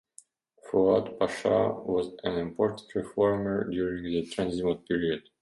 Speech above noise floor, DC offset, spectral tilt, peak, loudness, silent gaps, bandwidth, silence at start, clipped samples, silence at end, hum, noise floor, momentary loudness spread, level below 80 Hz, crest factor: 30 dB; under 0.1%; -6.5 dB/octave; -12 dBFS; -29 LUFS; none; 11.5 kHz; 0.65 s; under 0.1%; 0.2 s; none; -58 dBFS; 7 LU; -56 dBFS; 16 dB